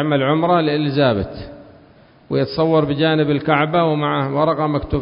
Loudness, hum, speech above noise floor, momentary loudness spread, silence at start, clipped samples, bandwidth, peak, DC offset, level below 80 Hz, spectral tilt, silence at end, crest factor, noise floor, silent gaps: -17 LUFS; none; 31 dB; 7 LU; 0 s; under 0.1%; 5.4 kHz; 0 dBFS; under 0.1%; -40 dBFS; -12 dB/octave; 0 s; 18 dB; -48 dBFS; none